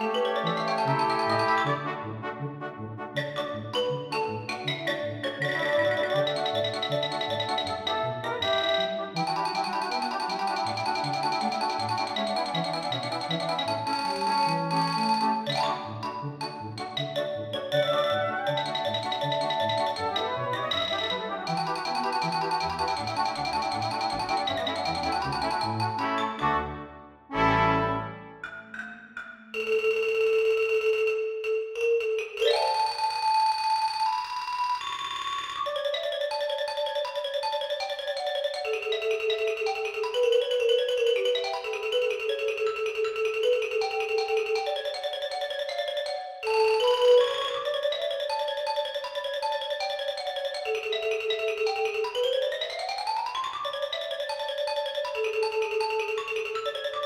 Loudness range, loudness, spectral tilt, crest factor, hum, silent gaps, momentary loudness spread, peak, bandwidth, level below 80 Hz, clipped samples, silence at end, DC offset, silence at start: 4 LU; -28 LUFS; -4 dB/octave; 18 dB; none; none; 7 LU; -10 dBFS; 15.5 kHz; -58 dBFS; under 0.1%; 0 s; under 0.1%; 0 s